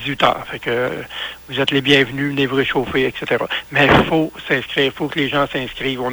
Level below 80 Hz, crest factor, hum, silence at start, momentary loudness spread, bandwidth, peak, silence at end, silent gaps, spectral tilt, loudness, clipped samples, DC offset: -42 dBFS; 18 dB; none; 0 s; 9 LU; over 20 kHz; 0 dBFS; 0 s; none; -5.5 dB/octave; -18 LUFS; under 0.1%; under 0.1%